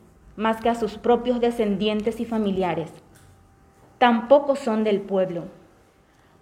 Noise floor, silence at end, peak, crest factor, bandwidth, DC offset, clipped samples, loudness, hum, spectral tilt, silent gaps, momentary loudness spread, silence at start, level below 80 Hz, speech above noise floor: -57 dBFS; 0.9 s; -4 dBFS; 20 dB; 13 kHz; under 0.1%; under 0.1%; -22 LUFS; none; -6.5 dB/octave; none; 9 LU; 0.35 s; -54 dBFS; 35 dB